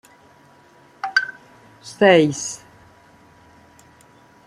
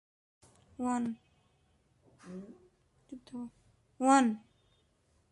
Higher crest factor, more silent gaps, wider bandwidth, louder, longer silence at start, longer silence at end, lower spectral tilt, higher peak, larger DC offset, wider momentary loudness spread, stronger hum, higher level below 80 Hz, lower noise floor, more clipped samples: about the same, 22 dB vs 22 dB; neither; first, 14 kHz vs 11.5 kHz; first, -18 LUFS vs -31 LUFS; first, 1.05 s vs 0.8 s; first, 1.9 s vs 0.95 s; about the same, -4 dB/octave vs -4.5 dB/octave; first, -2 dBFS vs -14 dBFS; neither; about the same, 24 LU vs 25 LU; neither; first, -66 dBFS vs -74 dBFS; second, -51 dBFS vs -72 dBFS; neither